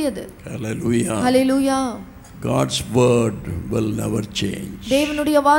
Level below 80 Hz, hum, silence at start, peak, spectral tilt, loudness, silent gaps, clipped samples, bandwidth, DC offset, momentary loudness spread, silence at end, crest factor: -42 dBFS; none; 0 s; -4 dBFS; -5.5 dB/octave; -20 LUFS; none; under 0.1%; 17 kHz; under 0.1%; 13 LU; 0 s; 16 dB